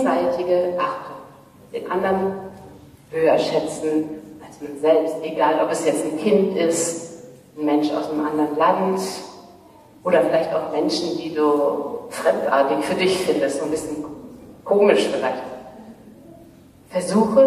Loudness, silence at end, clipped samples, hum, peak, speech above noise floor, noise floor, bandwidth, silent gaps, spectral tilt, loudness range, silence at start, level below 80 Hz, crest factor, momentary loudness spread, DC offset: -21 LUFS; 0 s; under 0.1%; none; -2 dBFS; 28 dB; -47 dBFS; 14.5 kHz; none; -4.5 dB/octave; 3 LU; 0 s; -60 dBFS; 18 dB; 17 LU; under 0.1%